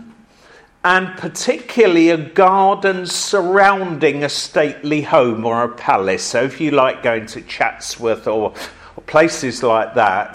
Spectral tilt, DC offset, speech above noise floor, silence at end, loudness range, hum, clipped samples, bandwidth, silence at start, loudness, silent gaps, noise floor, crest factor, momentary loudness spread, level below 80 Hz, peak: -4 dB/octave; under 0.1%; 31 dB; 0 s; 4 LU; none; under 0.1%; 15.5 kHz; 0 s; -16 LUFS; none; -47 dBFS; 16 dB; 9 LU; -54 dBFS; 0 dBFS